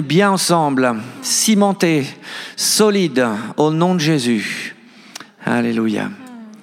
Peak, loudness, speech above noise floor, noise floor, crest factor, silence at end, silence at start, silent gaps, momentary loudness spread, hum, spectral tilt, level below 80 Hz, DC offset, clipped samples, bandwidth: -2 dBFS; -16 LUFS; 22 dB; -38 dBFS; 16 dB; 0.05 s; 0 s; none; 16 LU; none; -4 dB/octave; -74 dBFS; under 0.1%; under 0.1%; 17 kHz